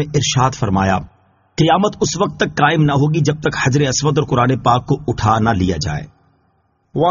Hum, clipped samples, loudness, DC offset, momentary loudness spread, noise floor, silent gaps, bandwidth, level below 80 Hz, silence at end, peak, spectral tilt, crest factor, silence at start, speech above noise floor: none; under 0.1%; -16 LUFS; under 0.1%; 6 LU; -61 dBFS; none; 7.4 kHz; -40 dBFS; 0 s; 0 dBFS; -5 dB/octave; 16 dB; 0 s; 46 dB